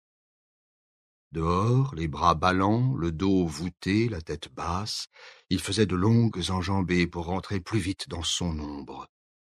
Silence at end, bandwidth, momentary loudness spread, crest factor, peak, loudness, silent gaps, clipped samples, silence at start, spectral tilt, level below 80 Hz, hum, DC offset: 0.5 s; 13 kHz; 12 LU; 22 dB; -6 dBFS; -27 LUFS; none; under 0.1%; 1.35 s; -5.5 dB/octave; -46 dBFS; none; under 0.1%